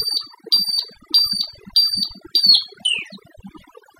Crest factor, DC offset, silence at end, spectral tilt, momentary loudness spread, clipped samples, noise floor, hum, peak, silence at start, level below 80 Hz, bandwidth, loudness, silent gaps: 18 dB; under 0.1%; 0.5 s; 0 dB/octave; 10 LU; under 0.1%; -46 dBFS; none; -2 dBFS; 0 s; -56 dBFS; 15.5 kHz; -16 LUFS; none